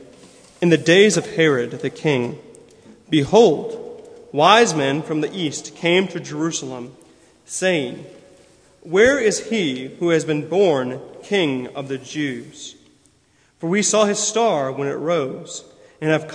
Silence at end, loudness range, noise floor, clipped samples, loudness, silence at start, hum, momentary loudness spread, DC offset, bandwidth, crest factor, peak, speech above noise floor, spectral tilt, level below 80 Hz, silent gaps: 0 s; 6 LU; -58 dBFS; under 0.1%; -19 LUFS; 0 s; none; 18 LU; under 0.1%; 10.5 kHz; 20 dB; 0 dBFS; 40 dB; -4 dB/octave; -58 dBFS; none